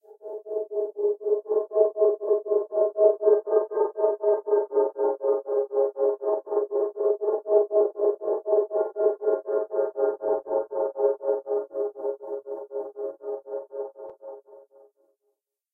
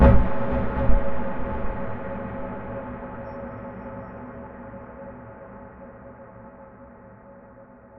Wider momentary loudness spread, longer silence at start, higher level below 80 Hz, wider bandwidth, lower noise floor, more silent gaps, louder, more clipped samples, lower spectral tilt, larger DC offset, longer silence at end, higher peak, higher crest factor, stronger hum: second, 13 LU vs 21 LU; about the same, 0.1 s vs 0 s; second, -84 dBFS vs -30 dBFS; second, 1.9 kHz vs 3.9 kHz; first, -77 dBFS vs -48 dBFS; neither; first, -26 LUFS vs -30 LUFS; neither; second, -9 dB/octave vs -11 dB/octave; neither; first, 1.15 s vs 0 s; about the same, -6 dBFS vs -4 dBFS; about the same, 20 dB vs 20 dB; neither